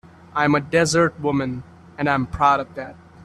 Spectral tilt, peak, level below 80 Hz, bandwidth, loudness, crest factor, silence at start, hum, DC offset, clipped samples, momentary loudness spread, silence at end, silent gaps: -5 dB/octave; -4 dBFS; -46 dBFS; 13 kHz; -20 LUFS; 18 dB; 0.35 s; none; under 0.1%; under 0.1%; 16 LU; 0 s; none